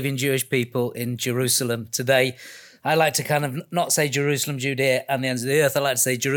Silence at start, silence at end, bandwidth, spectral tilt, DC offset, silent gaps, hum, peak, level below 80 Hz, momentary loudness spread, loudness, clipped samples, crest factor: 0 s; 0 s; 19 kHz; -3.5 dB/octave; under 0.1%; none; none; -4 dBFS; -72 dBFS; 6 LU; -22 LUFS; under 0.1%; 18 dB